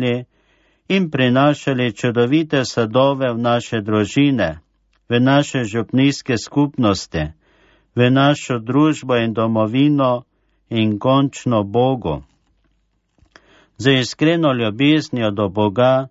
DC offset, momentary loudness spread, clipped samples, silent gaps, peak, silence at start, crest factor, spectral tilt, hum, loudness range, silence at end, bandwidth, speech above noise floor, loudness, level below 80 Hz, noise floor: under 0.1%; 7 LU; under 0.1%; none; -2 dBFS; 0 s; 16 dB; -6 dB/octave; none; 3 LU; 0.05 s; 8 kHz; 48 dB; -17 LUFS; -46 dBFS; -65 dBFS